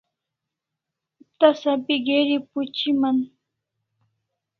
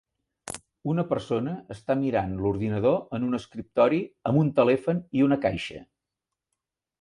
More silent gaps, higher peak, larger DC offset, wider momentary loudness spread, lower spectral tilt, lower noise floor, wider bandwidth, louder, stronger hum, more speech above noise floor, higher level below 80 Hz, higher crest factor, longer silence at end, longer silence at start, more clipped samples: neither; first, -2 dBFS vs -6 dBFS; neither; second, 7 LU vs 14 LU; second, -5 dB/octave vs -7 dB/octave; about the same, -84 dBFS vs -87 dBFS; second, 6.4 kHz vs 11.5 kHz; first, -21 LUFS vs -26 LUFS; neither; about the same, 64 dB vs 62 dB; second, -72 dBFS vs -54 dBFS; about the same, 22 dB vs 20 dB; first, 1.35 s vs 1.2 s; first, 1.4 s vs 0.45 s; neither